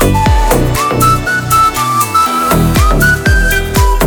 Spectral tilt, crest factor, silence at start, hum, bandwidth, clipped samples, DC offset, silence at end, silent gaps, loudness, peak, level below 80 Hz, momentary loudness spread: -4.5 dB/octave; 10 dB; 0 s; none; over 20 kHz; under 0.1%; under 0.1%; 0 s; none; -10 LUFS; 0 dBFS; -16 dBFS; 3 LU